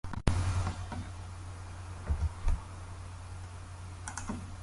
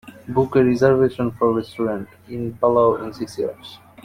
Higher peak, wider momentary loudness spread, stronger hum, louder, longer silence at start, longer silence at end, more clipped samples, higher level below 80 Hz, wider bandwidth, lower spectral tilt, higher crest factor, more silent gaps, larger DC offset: second, -10 dBFS vs -4 dBFS; about the same, 13 LU vs 14 LU; neither; second, -39 LUFS vs -20 LUFS; about the same, 0.05 s vs 0.05 s; second, 0 s vs 0.3 s; neither; first, -38 dBFS vs -52 dBFS; second, 11.5 kHz vs 14.5 kHz; second, -5.5 dB/octave vs -7.5 dB/octave; first, 26 dB vs 16 dB; neither; neither